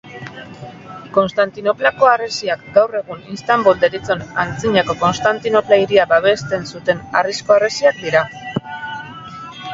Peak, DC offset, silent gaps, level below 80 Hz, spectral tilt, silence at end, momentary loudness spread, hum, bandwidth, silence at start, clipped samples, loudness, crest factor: 0 dBFS; under 0.1%; none; -52 dBFS; -4.5 dB/octave; 0 s; 19 LU; none; 7.8 kHz; 0.05 s; under 0.1%; -16 LUFS; 16 dB